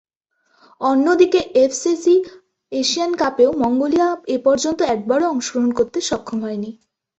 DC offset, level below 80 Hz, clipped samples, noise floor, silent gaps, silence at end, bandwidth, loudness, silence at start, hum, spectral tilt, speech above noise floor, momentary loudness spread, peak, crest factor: under 0.1%; -56 dBFS; under 0.1%; -66 dBFS; none; 0.5 s; 8.2 kHz; -18 LUFS; 0.8 s; none; -3.5 dB/octave; 49 dB; 10 LU; -2 dBFS; 16 dB